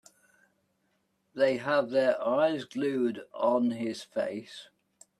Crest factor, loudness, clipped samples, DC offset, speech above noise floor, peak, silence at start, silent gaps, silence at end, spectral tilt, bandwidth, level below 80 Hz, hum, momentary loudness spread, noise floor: 18 dB; -29 LUFS; under 0.1%; under 0.1%; 46 dB; -12 dBFS; 1.35 s; none; 0.55 s; -5.5 dB/octave; 12 kHz; -78 dBFS; none; 12 LU; -75 dBFS